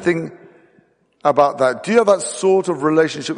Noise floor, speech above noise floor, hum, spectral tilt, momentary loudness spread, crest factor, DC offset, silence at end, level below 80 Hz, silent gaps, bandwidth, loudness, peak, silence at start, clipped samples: -57 dBFS; 40 dB; none; -5 dB/octave; 7 LU; 16 dB; under 0.1%; 0 s; -62 dBFS; none; 10 kHz; -17 LUFS; -2 dBFS; 0 s; under 0.1%